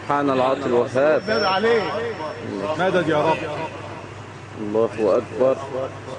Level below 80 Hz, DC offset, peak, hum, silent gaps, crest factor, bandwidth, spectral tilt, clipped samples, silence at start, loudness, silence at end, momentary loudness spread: -56 dBFS; under 0.1%; -4 dBFS; none; none; 18 dB; 10 kHz; -6 dB/octave; under 0.1%; 0 s; -21 LUFS; 0 s; 14 LU